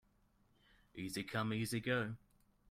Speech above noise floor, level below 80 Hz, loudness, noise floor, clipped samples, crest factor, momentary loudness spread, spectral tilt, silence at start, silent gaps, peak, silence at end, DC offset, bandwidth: 34 dB; -70 dBFS; -40 LUFS; -74 dBFS; under 0.1%; 20 dB; 14 LU; -5 dB/octave; 0.95 s; none; -24 dBFS; 0.55 s; under 0.1%; 16 kHz